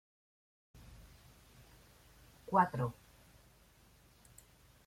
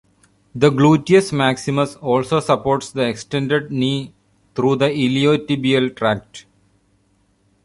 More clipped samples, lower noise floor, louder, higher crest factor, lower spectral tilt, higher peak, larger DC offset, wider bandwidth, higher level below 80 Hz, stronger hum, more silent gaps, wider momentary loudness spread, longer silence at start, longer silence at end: neither; first, -65 dBFS vs -61 dBFS; second, -34 LUFS vs -18 LUFS; first, 28 dB vs 16 dB; about the same, -7 dB/octave vs -6 dB/octave; second, -14 dBFS vs -2 dBFS; neither; first, 16.5 kHz vs 11.5 kHz; second, -66 dBFS vs -54 dBFS; second, none vs 50 Hz at -55 dBFS; neither; first, 29 LU vs 8 LU; first, 0.9 s vs 0.55 s; first, 1.95 s vs 1.25 s